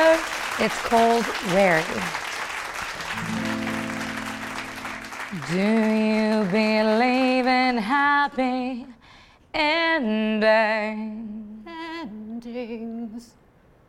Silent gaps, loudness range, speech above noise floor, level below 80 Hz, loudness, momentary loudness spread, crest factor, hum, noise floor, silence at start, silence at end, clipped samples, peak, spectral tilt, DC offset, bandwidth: none; 8 LU; 34 dB; -54 dBFS; -23 LUFS; 15 LU; 18 dB; none; -56 dBFS; 0 s; 0.65 s; under 0.1%; -6 dBFS; -4.5 dB/octave; under 0.1%; 16 kHz